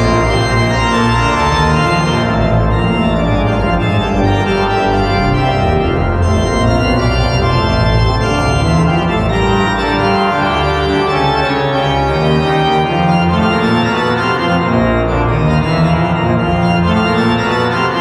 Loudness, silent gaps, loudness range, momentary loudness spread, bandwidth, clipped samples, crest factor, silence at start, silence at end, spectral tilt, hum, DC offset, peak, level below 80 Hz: -13 LUFS; none; 1 LU; 2 LU; 12 kHz; under 0.1%; 12 dB; 0 s; 0 s; -6.5 dB/octave; none; under 0.1%; 0 dBFS; -24 dBFS